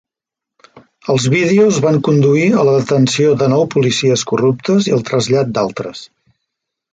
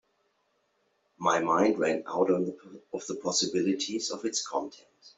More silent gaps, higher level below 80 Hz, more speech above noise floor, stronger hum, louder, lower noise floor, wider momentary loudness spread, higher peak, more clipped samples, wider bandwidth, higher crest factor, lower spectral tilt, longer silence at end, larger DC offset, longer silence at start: neither; first, -54 dBFS vs -74 dBFS; first, 71 dB vs 45 dB; neither; first, -13 LUFS vs -29 LUFS; first, -84 dBFS vs -74 dBFS; second, 7 LU vs 12 LU; first, -2 dBFS vs -12 dBFS; neither; first, 9.4 kHz vs 8.2 kHz; second, 12 dB vs 20 dB; first, -5.5 dB/octave vs -3.5 dB/octave; first, 0.9 s vs 0.1 s; neither; second, 0.75 s vs 1.2 s